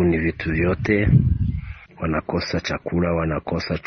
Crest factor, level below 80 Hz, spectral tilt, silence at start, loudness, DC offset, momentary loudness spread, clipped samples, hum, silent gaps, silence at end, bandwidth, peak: 16 dB; -32 dBFS; -7.5 dB/octave; 0 s; -22 LUFS; under 0.1%; 9 LU; under 0.1%; none; none; 0.05 s; 6.4 kHz; -4 dBFS